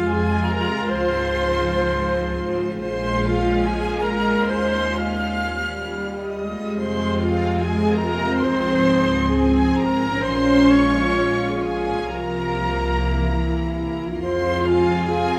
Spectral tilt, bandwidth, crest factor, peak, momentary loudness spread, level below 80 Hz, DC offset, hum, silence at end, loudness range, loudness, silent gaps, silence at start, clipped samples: -7 dB/octave; 10.5 kHz; 16 dB; -4 dBFS; 8 LU; -30 dBFS; under 0.1%; none; 0 s; 5 LU; -21 LUFS; none; 0 s; under 0.1%